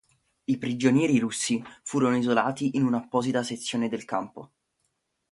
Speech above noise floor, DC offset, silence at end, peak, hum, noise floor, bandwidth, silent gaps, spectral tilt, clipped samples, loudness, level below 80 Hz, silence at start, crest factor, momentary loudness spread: 51 dB; under 0.1%; 0.85 s; -8 dBFS; none; -77 dBFS; 11.5 kHz; none; -5 dB/octave; under 0.1%; -26 LUFS; -68 dBFS; 0.5 s; 20 dB; 9 LU